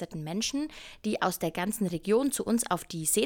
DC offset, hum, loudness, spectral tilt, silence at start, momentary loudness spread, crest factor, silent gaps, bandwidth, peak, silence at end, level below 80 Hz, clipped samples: under 0.1%; none; -30 LUFS; -4 dB/octave; 0 s; 8 LU; 18 dB; none; 19 kHz; -12 dBFS; 0 s; -58 dBFS; under 0.1%